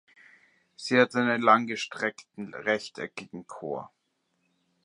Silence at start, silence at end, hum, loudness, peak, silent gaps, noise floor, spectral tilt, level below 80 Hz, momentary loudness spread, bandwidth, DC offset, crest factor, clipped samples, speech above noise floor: 0.8 s; 1 s; none; -26 LUFS; -6 dBFS; none; -76 dBFS; -4.5 dB/octave; -78 dBFS; 18 LU; 11 kHz; under 0.1%; 24 dB; under 0.1%; 48 dB